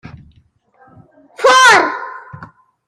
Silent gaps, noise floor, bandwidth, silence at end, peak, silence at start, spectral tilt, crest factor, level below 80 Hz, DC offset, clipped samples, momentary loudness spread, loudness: none; -53 dBFS; 15.5 kHz; 0.4 s; 0 dBFS; 1.4 s; -1 dB/octave; 16 dB; -56 dBFS; under 0.1%; under 0.1%; 23 LU; -9 LUFS